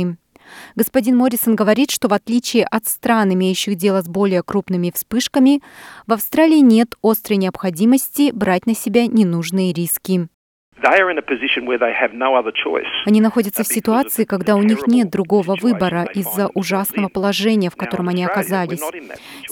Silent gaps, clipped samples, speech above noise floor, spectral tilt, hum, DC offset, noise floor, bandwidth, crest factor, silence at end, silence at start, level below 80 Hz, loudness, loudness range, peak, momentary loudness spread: 10.34-10.72 s; under 0.1%; 25 dB; -5 dB/octave; none; under 0.1%; -42 dBFS; 19 kHz; 16 dB; 0 s; 0 s; -58 dBFS; -17 LUFS; 2 LU; -2 dBFS; 7 LU